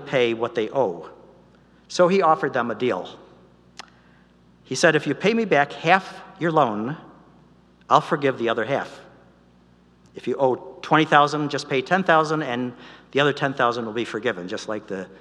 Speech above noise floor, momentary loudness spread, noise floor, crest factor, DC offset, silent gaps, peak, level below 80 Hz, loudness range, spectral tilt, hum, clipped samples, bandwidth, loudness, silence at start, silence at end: 33 dB; 13 LU; -55 dBFS; 22 dB; under 0.1%; none; 0 dBFS; -66 dBFS; 4 LU; -5 dB/octave; 60 Hz at -55 dBFS; under 0.1%; 11.5 kHz; -22 LUFS; 0 s; 0.05 s